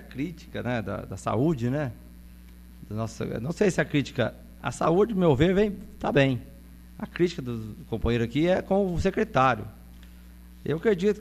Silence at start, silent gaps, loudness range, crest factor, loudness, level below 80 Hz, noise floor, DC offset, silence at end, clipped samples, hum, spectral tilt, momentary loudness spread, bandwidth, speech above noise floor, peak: 0 s; none; 5 LU; 20 dB; -26 LUFS; -44 dBFS; -47 dBFS; under 0.1%; 0 s; under 0.1%; none; -7 dB/octave; 12 LU; 14 kHz; 21 dB; -6 dBFS